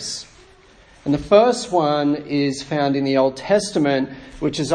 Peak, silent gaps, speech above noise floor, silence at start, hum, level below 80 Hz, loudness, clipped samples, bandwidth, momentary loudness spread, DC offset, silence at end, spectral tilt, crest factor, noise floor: -2 dBFS; none; 30 dB; 0 s; none; -48 dBFS; -19 LUFS; under 0.1%; 10.5 kHz; 12 LU; under 0.1%; 0 s; -5 dB/octave; 18 dB; -49 dBFS